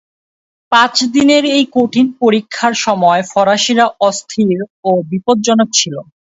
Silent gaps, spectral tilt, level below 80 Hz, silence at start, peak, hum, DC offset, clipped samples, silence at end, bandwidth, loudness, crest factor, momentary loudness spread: 4.70-4.83 s; -3.5 dB/octave; -58 dBFS; 0.7 s; 0 dBFS; none; under 0.1%; under 0.1%; 0.35 s; 8 kHz; -12 LUFS; 12 dB; 6 LU